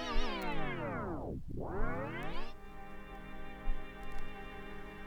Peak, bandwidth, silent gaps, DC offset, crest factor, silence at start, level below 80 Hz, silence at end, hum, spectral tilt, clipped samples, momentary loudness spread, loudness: -20 dBFS; 6.6 kHz; none; under 0.1%; 16 dB; 0 s; -40 dBFS; 0 s; 50 Hz at -60 dBFS; -6 dB/octave; under 0.1%; 12 LU; -43 LUFS